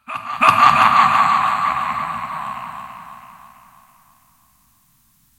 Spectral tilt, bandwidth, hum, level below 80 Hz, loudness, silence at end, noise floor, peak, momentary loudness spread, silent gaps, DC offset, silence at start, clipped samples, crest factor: -3 dB/octave; 16.5 kHz; none; -56 dBFS; -15 LUFS; 2.1 s; -58 dBFS; 0 dBFS; 21 LU; none; under 0.1%; 0.1 s; under 0.1%; 18 dB